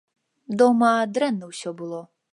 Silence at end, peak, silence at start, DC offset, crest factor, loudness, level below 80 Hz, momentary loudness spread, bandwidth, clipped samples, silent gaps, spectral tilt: 0.3 s; -6 dBFS; 0.5 s; under 0.1%; 18 dB; -21 LUFS; -76 dBFS; 17 LU; 11.5 kHz; under 0.1%; none; -5.5 dB/octave